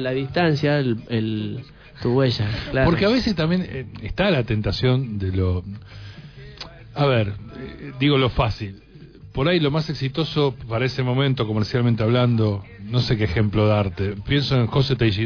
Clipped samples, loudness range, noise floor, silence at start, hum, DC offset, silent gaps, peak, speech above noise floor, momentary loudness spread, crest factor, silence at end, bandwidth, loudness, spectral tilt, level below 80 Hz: under 0.1%; 3 LU; -43 dBFS; 0 s; none; under 0.1%; none; -6 dBFS; 22 dB; 16 LU; 14 dB; 0 s; 5.4 kHz; -21 LUFS; -7.5 dB/octave; -40 dBFS